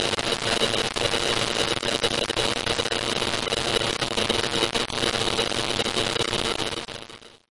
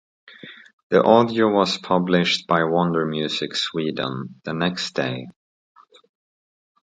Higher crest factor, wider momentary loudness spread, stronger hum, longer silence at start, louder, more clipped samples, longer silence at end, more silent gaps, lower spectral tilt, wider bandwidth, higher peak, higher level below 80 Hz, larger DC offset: about the same, 20 dB vs 22 dB; second, 2 LU vs 14 LU; neither; second, 0 s vs 0.3 s; about the same, -23 LUFS vs -21 LUFS; neither; second, 0.15 s vs 1.5 s; second, none vs 0.73-0.90 s; second, -2.5 dB/octave vs -5.5 dB/octave; first, 11.5 kHz vs 9.2 kHz; second, -6 dBFS vs 0 dBFS; first, -46 dBFS vs -62 dBFS; neither